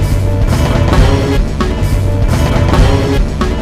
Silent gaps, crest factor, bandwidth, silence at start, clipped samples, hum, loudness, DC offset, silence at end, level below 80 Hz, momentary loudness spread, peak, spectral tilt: none; 10 dB; 15.5 kHz; 0 s; 0.2%; none; -12 LUFS; under 0.1%; 0 s; -14 dBFS; 4 LU; 0 dBFS; -6.5 dB/octave